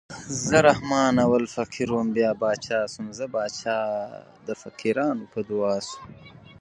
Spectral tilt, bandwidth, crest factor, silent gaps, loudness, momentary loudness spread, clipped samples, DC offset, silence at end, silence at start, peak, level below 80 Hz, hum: -5 dB/octave; 11 kHz; 22 dB; none; -24 LUFS; 16 LU; under 0.1%; under 0.1%; 0.1 s; 0.1 s; -2 dBFS; -56 dBFS; none